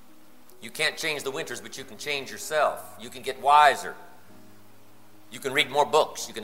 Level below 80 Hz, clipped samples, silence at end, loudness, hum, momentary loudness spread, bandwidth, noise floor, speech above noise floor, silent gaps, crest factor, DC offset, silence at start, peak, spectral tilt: -72 dBFS; under 0.1%; 0 s; -25 LUFS; none; 21 LU; 16 kHz; -56 dBFS; 30 dB; none; 22 dB; 0.5%; 0.6 s; -6 dBFS; -2 dB/octave